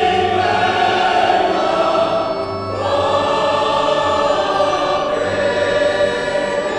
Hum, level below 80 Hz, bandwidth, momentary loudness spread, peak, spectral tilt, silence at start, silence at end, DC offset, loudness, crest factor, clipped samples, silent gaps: none; -46 dBFS; 10 kHz; 4 LU; -2 dBFS; -4.5 dB/octave; 0 s; 0 s; under 0.1%; -16 LUFS; 14 dB; under 0.1%; none